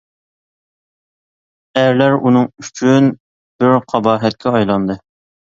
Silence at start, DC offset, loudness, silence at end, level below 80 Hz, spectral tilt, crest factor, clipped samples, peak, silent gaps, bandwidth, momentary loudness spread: 1.75 s; under 0.1%; -14 LUFS; 0.45 s; -54 dBFS; -6.5 dB/octave; 16 dB; under 0.1%; 0 dBFS; 3.20-3.59 s; 7.6 kHz; 9 LU